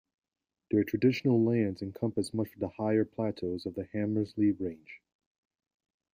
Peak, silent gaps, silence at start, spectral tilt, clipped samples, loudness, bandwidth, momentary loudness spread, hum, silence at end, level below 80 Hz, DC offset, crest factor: -14 dBFS; none; 0.7 s; -7.5 dB/octave; under 0.1%; -31 LUFS; 15.5 kHz; 10 LU; none; 1.15 s; -68 dBFS; under 0.1%; 18 dB